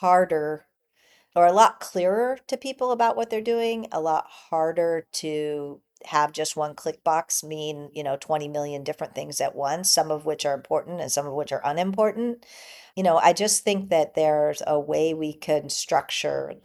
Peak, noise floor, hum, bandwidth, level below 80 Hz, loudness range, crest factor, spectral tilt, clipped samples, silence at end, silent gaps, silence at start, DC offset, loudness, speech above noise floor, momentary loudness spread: -4 dBFS; -62 dBFS; none; 14.5 kHz; -70 dBFS; 5 LU; 22 dB; -3 dB/octave; under 0.1%; 0.1 s; none; 0 s; under 0.1%; -24 LUFS; 38 dB; 12 LU